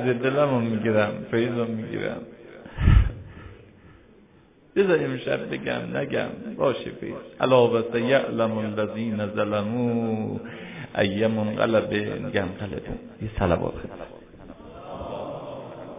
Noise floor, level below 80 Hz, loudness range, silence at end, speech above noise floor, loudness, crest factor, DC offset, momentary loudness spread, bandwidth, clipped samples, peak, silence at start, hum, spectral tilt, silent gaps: -55 dBFS; -34 dBFS; 4 LU; 0 s; 30 dB; -25 LUFS; 20 dB; under 0.1%; 17 LU; 3.8 kHz; under 0.1%; -4 dBFS; 0 s; none; -11 dB/octave; none